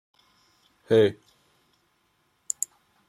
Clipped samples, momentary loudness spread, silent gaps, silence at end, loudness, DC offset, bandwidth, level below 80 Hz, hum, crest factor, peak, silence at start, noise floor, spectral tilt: under 0.1%; 12 LU; none; 1.95 s; -25 LUFS; under 0.1%; 15 kHz; -74 dBFS; none; 22 dB; -6 dBFS; 0.9 s; -70 dBFS; -4.5 dB/octave